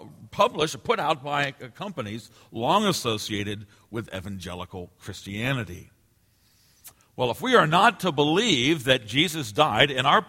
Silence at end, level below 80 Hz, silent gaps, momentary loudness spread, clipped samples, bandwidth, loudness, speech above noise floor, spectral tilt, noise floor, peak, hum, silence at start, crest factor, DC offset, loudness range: 0.05 s; -56 dBFS; none; 19 LU; under 0.1%; 16.5 kHz; -23 LUFS; 39 dB; -4 dB/octave; -64 dBFS; -2 dBFS; none; 0 s; 24 dB; under 0.1%; 12 LU